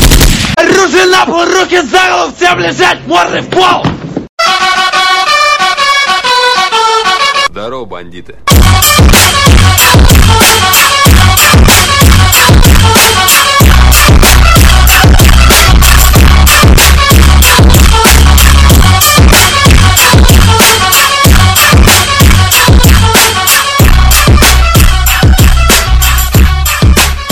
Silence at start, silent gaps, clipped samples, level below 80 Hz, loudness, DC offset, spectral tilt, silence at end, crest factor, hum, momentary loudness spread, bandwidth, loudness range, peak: 0 s; 4.29-4.37 s; 8%; -8 dBFS; -4 LUFS; under 0.1%; -3.5 dB/octave; 0 s; 4 dB; none; 5 LU; over 20 kHz; 4 LU; 0 dBFS